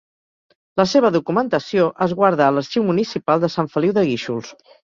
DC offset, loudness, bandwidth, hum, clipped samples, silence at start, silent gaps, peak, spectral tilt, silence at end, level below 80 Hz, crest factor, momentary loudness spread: under 0.1%; -19 LUFS; 7.6 kHz; none; under 0.1%; 0.75 s; none; -2 dBFS; -6.5 dB/octave; 0.35 s; -60 dBFS; 16 dB; 6 LU